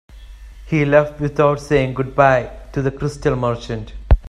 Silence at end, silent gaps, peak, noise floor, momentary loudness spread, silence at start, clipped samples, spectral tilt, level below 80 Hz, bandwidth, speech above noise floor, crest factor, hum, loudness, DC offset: 0 s; none; 0 dBFS; -37 dBFS; 10 LU; 0.15 s; under 0.1%; -7.5 dB/octave; -26 dBFS; 11.5 kHz; 20 dB; 18 dB; none; -18 LUFS; under 0.1%